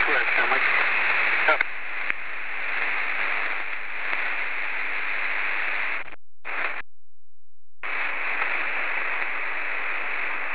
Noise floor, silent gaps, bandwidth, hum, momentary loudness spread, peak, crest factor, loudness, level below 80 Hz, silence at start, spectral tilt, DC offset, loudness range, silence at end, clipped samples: under -90 dBFS; none; 4 kHz; none; 10 LU; -6 dBFS; 22 dB; -24 LUFS; -70 dBFS; 0 s; -5 dB/octave; 4%; 6 LU; 0 s; under 0.1%